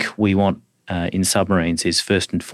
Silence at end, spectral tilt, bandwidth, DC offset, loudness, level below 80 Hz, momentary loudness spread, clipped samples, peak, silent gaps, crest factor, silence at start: 0 s; -4.5 dB/octave; 14.5 kHz; under 0.1%; -19 LUFS; -50 dBFS; 8 LU; under 0.1%; -6 dBFS; none; 14 dB; 0 s